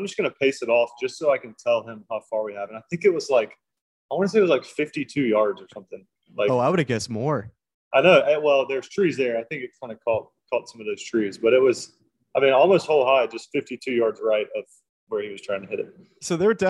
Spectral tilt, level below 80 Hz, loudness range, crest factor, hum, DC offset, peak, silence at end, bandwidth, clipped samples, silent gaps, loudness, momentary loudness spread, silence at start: -5 dB/octave; -68 dBFS; 4 LU; 20 dB; none; under 0.1%; -2 dBFS; 0 s; 11.5 kHz; under 0.1%; 3.81-4.09 s, 7.74-7.91 s, 14.89-15.07 s; -23 LUFS; 15 LU; 0 s